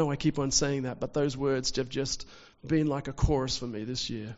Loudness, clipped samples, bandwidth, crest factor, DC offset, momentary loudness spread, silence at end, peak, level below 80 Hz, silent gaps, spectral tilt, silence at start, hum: -30 LUFS; under 0.1%; 8 kHz; 20 dB; under 0.1%; 7 LU; 0 s; -10 dBFS; -42 dBFS; none; -5 dB/octave; 0 s; none